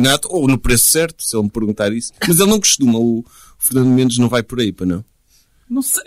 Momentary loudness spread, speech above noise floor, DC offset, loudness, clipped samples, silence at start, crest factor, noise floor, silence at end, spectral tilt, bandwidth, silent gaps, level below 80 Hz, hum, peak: 10 LU; 40 dB; under 0.1%; -15 LUFS; under 0.1%; 0 s; 14 dB; -55 dBFS; 0.05 s; -3.5 dB/octave; 16 kHz; none; -34 dBFS; none; -2 dBFS